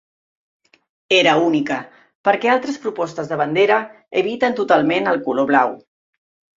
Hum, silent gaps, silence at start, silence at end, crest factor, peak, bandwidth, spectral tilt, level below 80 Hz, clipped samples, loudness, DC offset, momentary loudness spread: none; 2.15-2.24 s; 1.1 s; 0.8 s; 18 dB; -2 dBFS; 7.8 kHz; -5 dB/octave; -64 dBFS; under 0.1%; -18 LUFS; under 0.1%; 9 LU